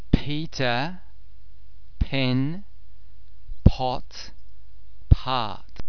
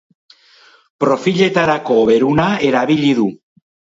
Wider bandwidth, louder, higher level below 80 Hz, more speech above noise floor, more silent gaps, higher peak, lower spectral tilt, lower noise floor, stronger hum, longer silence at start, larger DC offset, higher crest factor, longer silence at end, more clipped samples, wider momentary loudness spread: second, 5.4 kHz vs 7.8 kHz; second, -25 LUFS vs -14 LUFS; first, -32 dBFS vs -52 dBFS; second, 24 dB vs 35 dB; neither; about the same, 0 dBFS vs 0 dBFS; about the same, -7 dB/octave vs -6 dB/octave; about the same, -50 dBFS vs -48 dBFS; neither; second, 0.15 s vs 1 s; first, 4% vs under 0.1%; first, 26 dB vs 16 dB; second, 0 s vs 0.65 s; neither; first, 17 LU vs 5 LU